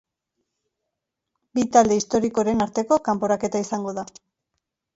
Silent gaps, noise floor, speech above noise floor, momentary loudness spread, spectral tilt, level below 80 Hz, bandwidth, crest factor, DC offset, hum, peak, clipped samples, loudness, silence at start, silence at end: none; -82 dBFS; 61 dB; 12 LU; -5 dB/octave; -58 dBFS; 8 kHz; 22 dB; under 0.1%; none; -2 dBFS; under 0.1%; -22 LUFS; 1.55 s; 0.9 s